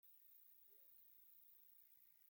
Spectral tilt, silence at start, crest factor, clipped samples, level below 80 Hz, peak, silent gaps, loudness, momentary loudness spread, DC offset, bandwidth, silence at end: -0.5 dB/octave; 0.05 s; 12 dB; under 0.1%; under -90 dBFS; -58 dBFS; none; -65 LUFS; 1 LU; under 0.1%; 17 kHz; 0 s